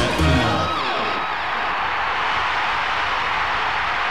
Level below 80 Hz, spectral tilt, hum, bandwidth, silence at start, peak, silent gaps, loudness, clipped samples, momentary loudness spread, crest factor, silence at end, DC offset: -34 dBFS; -4.5 dB/octave; none; 15.5 kHz; 0 s; -8 dBFS; none; -20 LUFS; under 0.1%; 4 LU; 14 dB; 0 s; 1%